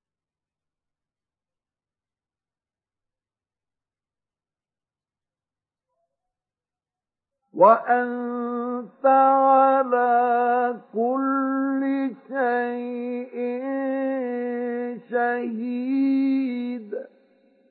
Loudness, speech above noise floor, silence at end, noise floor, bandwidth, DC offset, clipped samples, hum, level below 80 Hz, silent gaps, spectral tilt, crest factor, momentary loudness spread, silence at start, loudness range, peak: -22 LUFS; over 68 dB; 0.65 s; under -90 dBFS; 4.6 kHz; under 0.1%; under 0.1%; none; under -90 dBFS; none; -10 dB/octave; 22 dB; 13 LU; 7.55 s; 7 LU; -4 dBFS